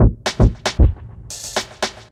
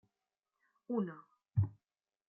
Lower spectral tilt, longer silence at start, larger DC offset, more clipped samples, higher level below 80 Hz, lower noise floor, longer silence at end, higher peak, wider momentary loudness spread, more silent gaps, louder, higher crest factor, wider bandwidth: second, -5 dB/octave vs -12 dB/octave; second, 0 s vs 0.9 s; neither; neither; first, -20 dBFS vs -70 dBFS; second, -34 dBFS vs under -90 dBFS; second, 0.2 s vs 0.55 s; first, 0 dBFS vs -20 dBFS; first, 14 LU vs 6 LU; neither; first, -19 LUFS vs -39 LUFS; about the same, 18 dB vs 20 dB; first, 14 kHz vs 3.1 kHz